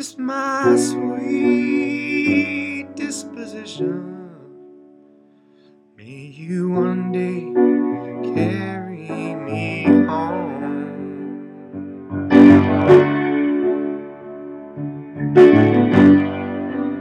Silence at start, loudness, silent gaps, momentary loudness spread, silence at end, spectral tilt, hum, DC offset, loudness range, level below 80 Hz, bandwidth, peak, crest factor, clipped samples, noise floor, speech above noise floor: 0 s; -17 LUFS; none; 21 LU; 0 s; -7 dB/octave; none; under 0.1%; 13 LU; -60 dBFS; 11 kHz; 0 dBFS; 18 dB; under 0.1%; -52 dBFS; 32 dB